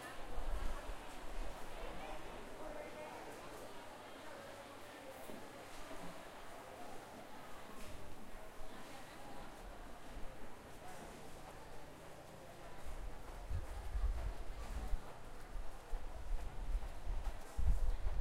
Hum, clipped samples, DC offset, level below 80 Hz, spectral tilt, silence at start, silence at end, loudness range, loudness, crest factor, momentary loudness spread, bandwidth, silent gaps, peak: none; under 0.1%; under 0.1%; -46 dBFS; -5 dB/octave; 0 s; 0 s; 6 LU; -50 LUFS; 22 dB; 10 LU; 15.5 kHz; none; -22 dBFS